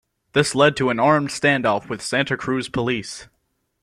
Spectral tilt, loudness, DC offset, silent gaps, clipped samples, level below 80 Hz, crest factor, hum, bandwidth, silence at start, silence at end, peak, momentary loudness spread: -4.5 dB/octave; -20 LUFS; under 0.1%; none; under 0.1%; -54 dBFS; 18 dB; none; 13.5 kHz; 0.35 s; 0.6 s; -2 dBFS; 7 LU